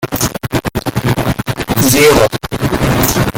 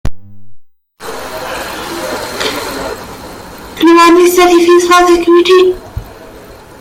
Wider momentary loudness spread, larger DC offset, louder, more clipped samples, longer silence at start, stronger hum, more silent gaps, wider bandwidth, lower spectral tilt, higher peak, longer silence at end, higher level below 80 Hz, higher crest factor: second, 10 LU vs 22 LU; neither; second, -13 LUFS vs -9 LUFS; neither; about the same, 0 s vs 0.05 s; neither; neither; about the same, 17.5 kHz vs 16 kHz; about the same, -4.5 dB/octave vs -4 dB/octave; about the same, 0 dBFS vs 0 dBFS; second, 0 s vs 0.25 s; first, -28 dBFS vs -34 dBFS; about the same, 12 dB vs 10 dB